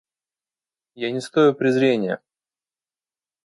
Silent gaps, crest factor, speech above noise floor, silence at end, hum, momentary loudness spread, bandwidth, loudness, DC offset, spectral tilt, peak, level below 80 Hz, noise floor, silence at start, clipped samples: none; 18 dB; over 70 dB; 1.25 s; none; 12 LU; 11.5 kHz; -20 LUFS; under 0.1%; -6 dB/octave; -6 dBFS; -72 dBFS; under -90 dBFS; 0.95 s; under 0.1%